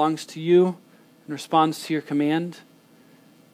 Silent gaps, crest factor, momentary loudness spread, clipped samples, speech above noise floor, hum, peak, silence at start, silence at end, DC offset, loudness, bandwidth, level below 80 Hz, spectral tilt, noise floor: none; 18 dB; 16 LU; under 0.1%; 32 dB; none; -6 dBFS; 0 s; 0.95 s; under 0.1%; -22 LUFS; 15.5 kHz; -80 dBFS; -6 dB/octave; -54 dBFS